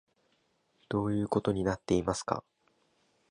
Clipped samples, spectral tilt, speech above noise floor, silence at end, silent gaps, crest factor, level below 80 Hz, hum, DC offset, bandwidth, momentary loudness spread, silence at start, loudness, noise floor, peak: under 0.1%; -6 dB/octave; 43 dB; 0.9 s; none; 24 dB; -54 dBFS; none; under 0.1%; 11 kHz; 6 LU; 0.9 s; -32 LUFS; -73 dBFS; -10 dBFS